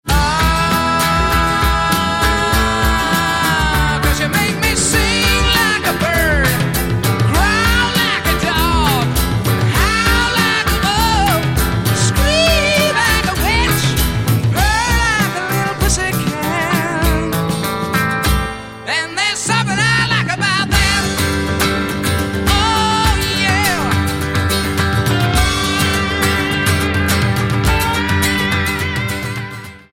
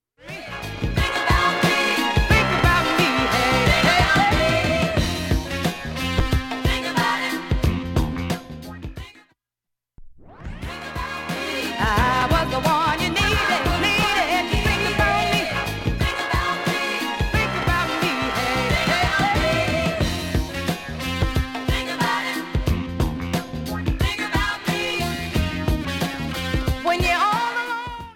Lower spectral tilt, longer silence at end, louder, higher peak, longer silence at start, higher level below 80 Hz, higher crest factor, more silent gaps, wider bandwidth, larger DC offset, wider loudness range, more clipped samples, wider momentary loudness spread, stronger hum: about the same, -4 dB/octave vs -4.5 dB/octave; first, 0.15 s vs 0 s; first, -14 LUFS vs -21 LUFS; about the same, -2 dBFS vs -4 dBFS; second, 0.05 s vs 0.2 s; first, -24 dBFS vs -30 dBFS; about the same, 14 dB vs 18 dB; neither; about the same, 17 kHz vs 17 kHz; neither; second, 3 LU vs 7 LU; neither; second, 5 LU vs 10 LU; neither